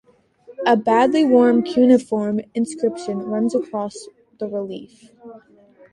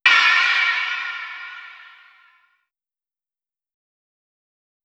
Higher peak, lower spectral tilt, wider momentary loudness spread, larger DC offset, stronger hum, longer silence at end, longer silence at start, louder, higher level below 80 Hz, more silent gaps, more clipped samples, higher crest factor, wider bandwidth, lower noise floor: about the same, -2 dBFS vs 0 dBFS; first, -6 dB/octave vs 3.5 dB/octave; second, 15 LU vs 23 LU; neither; neither; second, 0.55 s vs 3 s; first, 0.5 s vs 0.05 s; about the same, -19 LUFS vs -17 LUFS; first, -64 dBFS vs under -90 dBFS; neither; neither; second, 16 dB vs 24 dB; about the same, 11 kHz vs 10.5 kHz; second, -48 dBFS vs under -90 dBFS